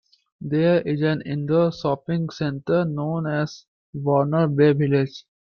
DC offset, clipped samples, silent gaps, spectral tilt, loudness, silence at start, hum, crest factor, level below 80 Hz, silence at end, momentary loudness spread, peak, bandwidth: under 0.1%; under 0.1%; 3.68-3.93 s; -8.5 dB/octave; -22 LUFS; 0.4 s; none; 16 dB; -60 dBFS; 0.25 s; 10 LU; -6 dBFS; 6.8 kHz